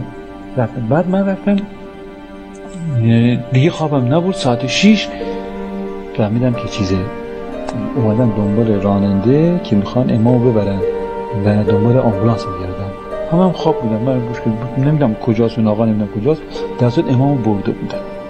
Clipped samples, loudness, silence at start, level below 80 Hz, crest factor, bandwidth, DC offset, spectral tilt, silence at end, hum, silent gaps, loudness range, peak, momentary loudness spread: under 0.1%; -16 LUFS; 0 s; -38 dBFS; 16 dB; 9 kHz; under 0.1%; -7.5 dB/octave; 0 s; none; none; 3 LU; 0 dBFS; 12 LU